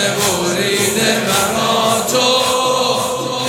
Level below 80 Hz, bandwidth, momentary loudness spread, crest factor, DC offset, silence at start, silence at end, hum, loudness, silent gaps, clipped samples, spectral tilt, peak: -50 dBFS; 17.5 kHz; 3 LU; 14 dB; under 0.1%; 0 s; 0 s; none; -14 LUFS; none; under 0.1%; -2.5 dB/octave; 0 dBFS